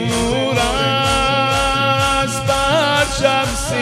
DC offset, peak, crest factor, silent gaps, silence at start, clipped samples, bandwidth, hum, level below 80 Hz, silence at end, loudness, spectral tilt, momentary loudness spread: under 0.1%; -2 dBFS; 14 dB; none; 0 s; under 0.1%; 16 kHz; none; -30 dBFS; 0 s; -15 LUFS; -3.5 dB/octave; 3 LU